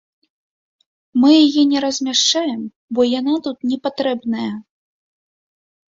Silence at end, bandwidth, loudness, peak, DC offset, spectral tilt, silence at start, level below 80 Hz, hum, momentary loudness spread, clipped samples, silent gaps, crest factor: 1.35 s; 7.8 kHz; -17 LUFS; -2 dBFS; under 0.1%; -3 dB/octave; 1.15 s; -64 dBFS; none; 13 LU; under 0.1%; 2.76-2.88 s; 16 dB